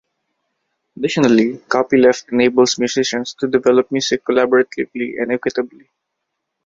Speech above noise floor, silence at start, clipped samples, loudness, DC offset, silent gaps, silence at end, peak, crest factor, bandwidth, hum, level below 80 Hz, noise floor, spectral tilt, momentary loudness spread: 60 dB; 0.95 s; under 0.1%; -16 LUFS; under 0.1%; none; 1 s; 0 dBFS; 16 dB; 7.8 kHz; none; -58 dBFS; -76 dBFS; -4 dB/octave; 9 LU